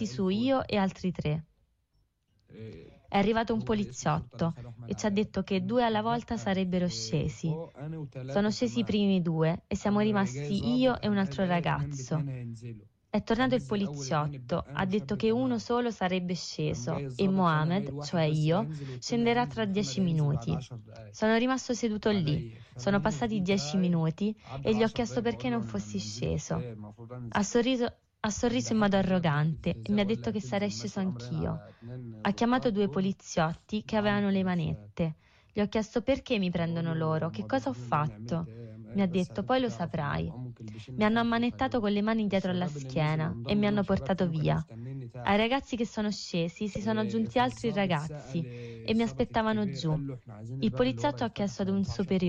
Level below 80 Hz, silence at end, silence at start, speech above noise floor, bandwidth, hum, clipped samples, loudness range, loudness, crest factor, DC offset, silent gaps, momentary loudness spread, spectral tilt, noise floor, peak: -54 dBFS; 0 s; 0 s; 43 dB; 8.2 kHz; none; under 0.1%; 3 LU; -30 LUFS; 14 dB; under 0.1%; none; 9 LU; -6 dB/octave; -73 dBFS; -16 dBFS